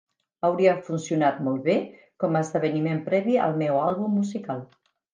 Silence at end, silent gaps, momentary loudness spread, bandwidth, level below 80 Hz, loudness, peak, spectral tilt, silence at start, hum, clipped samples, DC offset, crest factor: 0.5 s; none; 8 LU; 9.8 kHz; -72 dBFS; -25 LUFS; -6 dBFS; -7 dB/octave; 0.45 s; none; under 0.1%; under 0.1%; 18 dB